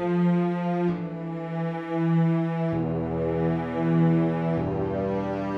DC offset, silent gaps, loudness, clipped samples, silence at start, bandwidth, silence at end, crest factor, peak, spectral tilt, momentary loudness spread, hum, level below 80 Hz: under 0.1%; none; -26 LUFS; under 0.1%; 0 s; 4.7 kHz; 0 s; 14 dB; -12 dBFS; -10 dB/octave; 7 LU; none; -50 dBFS